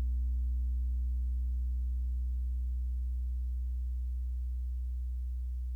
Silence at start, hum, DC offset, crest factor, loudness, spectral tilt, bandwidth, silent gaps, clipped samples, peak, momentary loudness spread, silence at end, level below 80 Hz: 0 s; none; under 0.1%; 6 dB; -37 LUFS; -8.5 dB/octave; 0.3 kHz; none; under 0.1%; -28 dBFS; 4 LU; 0 s; -34 dBFS